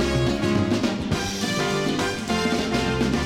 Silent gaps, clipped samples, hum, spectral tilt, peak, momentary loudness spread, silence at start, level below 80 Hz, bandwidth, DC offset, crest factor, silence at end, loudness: none; under 0.1%; none; -5 dB/octave; -10 dBFS; 3 LU; 0 s; -38 dBFS; 16.5 kHz; under 0.1%; 14 dB; 0 s; -23 LUFS